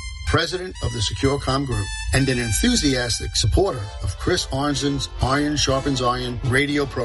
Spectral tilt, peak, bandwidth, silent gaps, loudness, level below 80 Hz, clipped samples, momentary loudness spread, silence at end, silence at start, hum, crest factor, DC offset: -4 dB/octave; -6 dBFS; 11.5 kHz; none; -21 LUFS; -32 dBFS; under 0.1%; 6 LU; 0 s; 0 s; none; 16 dB; under 0.1%